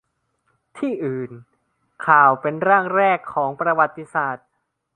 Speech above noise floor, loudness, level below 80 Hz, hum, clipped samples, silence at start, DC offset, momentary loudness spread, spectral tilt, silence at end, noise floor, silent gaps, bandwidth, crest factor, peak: 54 dB; -19 LUFS; -68 dBFS; none; under 0.1%; 0.75 s; under 0.1%; 14 LU; -7.5 dB/octave; 0.6 s; -73 dBFS; none; 9.8 kHz; 20 dB; 0 dBFS